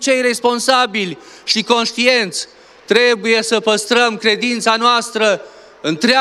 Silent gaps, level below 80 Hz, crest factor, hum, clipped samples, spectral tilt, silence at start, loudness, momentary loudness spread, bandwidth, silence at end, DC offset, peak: none; -66 dBFS; 16 dB; none; under 0.1%; -2.5 dB/octave; 0 s; -14 LUFS; 10 LU; 13.5 kHz; 0 s; under 0.1%; 0 dBFS